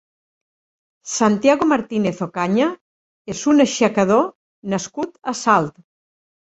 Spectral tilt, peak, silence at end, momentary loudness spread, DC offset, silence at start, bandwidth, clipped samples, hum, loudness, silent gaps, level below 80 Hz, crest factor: -5 dB/octave; -2 dBFS; 0.75 s; 14 LU; under 0.1%; 1.05 s; 8.2 kHz; under 0.1%; none; -19 LUFS; 2.81-3.25 s, 4.35-4.62 s; -60 dBFS; 18 dB